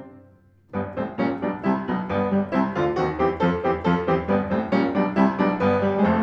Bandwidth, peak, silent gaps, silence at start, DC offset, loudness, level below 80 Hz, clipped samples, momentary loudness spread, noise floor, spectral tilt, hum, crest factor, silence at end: 6.6 kHz; -6 dBFS; none; 0 s; under 0.1%; -23 LUFS; -48 dBFS; under 0.1%; 5 LU; -54 dBFS; -8.5 dB/octave; none; 16 dB; 0 s